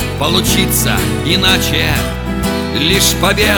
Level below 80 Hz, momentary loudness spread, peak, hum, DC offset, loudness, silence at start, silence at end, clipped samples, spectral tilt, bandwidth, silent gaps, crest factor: -24 dBFS; 7 LU; 0 dBFS; none; under 0.1%; -12 LUFS; 0 s; 0 s; under 0.1%; -3.5 dB/octave; over 20 kHz; none; 14 dB